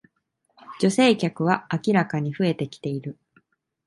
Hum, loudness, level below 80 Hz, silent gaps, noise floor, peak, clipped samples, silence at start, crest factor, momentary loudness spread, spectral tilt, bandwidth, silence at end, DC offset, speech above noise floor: none; -23 LUFS; -66 dBFS; none; -73 dBFS; -4 dBFS; under 0.1%; 0.7 s; 22 dB; 12 LU; -6 dB/octave; 11.5 kHz; 0.75 s; under 0.1%; 50 dB